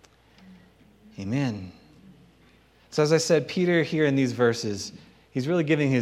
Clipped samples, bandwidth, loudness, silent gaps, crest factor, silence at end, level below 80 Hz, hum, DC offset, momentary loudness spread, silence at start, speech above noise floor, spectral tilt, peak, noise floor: under 0.1%; 14 kHz; -25 LUFS; none; 18 dB; 0 s; -66 dBFS; none; under 0.1%; 14 LU; 0.45 s; 34 dB; -5.5 dB/octave; -8 dBFS; -58 dBFS